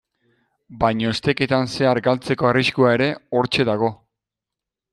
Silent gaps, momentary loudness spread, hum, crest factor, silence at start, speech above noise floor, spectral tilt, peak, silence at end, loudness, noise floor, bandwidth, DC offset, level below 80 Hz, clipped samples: none; 5 LU; none; 18 dB; 0.7 s; 67 dB; -6 dB/octave; -4 dBFS; 1 s; -19 LUFS; -86 dBFS; 12 kHz; under 0.1%; -50 dBFS; under 0.1%